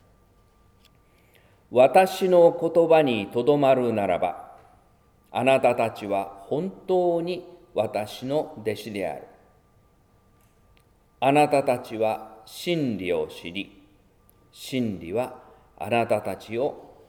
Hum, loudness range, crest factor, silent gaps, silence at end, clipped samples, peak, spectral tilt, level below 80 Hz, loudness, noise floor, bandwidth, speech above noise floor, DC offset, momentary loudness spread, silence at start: none; 10 LU; 20 dB; none; 0.25 s; under 0.1%; -4 dBFS; -6 dB/octave; -62 dBFS; -24 LUFS; -60 dBFS; 18 kHz; 37 dB; under 0.1%; 15 LU; 1.7 s